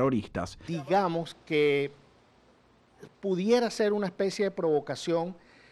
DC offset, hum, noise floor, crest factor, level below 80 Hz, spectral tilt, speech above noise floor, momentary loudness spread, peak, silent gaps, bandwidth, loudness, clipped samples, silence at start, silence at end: under 0.1%; none; -62 dBFS; 18 dB; -62 dBFS; -6 dB/octave; 33 dB; 11 LU; -12 dBFS; none; 12.5 kHz; -29 LUFS; under 0.1%; 0 s; 0.4 s